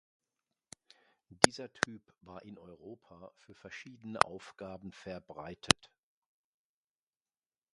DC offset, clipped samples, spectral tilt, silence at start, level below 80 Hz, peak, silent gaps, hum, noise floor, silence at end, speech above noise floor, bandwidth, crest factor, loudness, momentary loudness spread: under 0.1%; under 0.1%; -2.5 dB/octave; 1.4 s; -64 dBFS; 0 dBFS; none; none; under -90 dBFS; 2 s; over 53 dB; 11.5 kHz; 38 dB; -31 LUFS; 27 LU